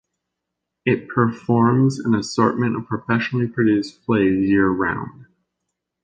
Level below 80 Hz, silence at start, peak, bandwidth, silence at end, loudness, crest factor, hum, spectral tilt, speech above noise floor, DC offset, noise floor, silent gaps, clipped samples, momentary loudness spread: -52 dBFS; 0.85 s; -2 dBFS; 9.2 kHz; 0.8 s; -20 LUFS; 18 dB; none; -7 dB/octave; 62 dB; under 0.1%; -81 dBFS; none; under 0.1%; 6 LU